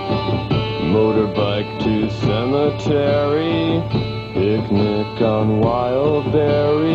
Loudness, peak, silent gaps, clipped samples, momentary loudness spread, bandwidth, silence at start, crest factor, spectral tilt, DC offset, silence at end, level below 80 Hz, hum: -18 LUFS; -4 dBFS; none; under 0.1%; 4 LU; 7.6 kHz; 0 s; 14 dB; -8 dB/octave; under 0.1%; 0 s; -40 dBFS; none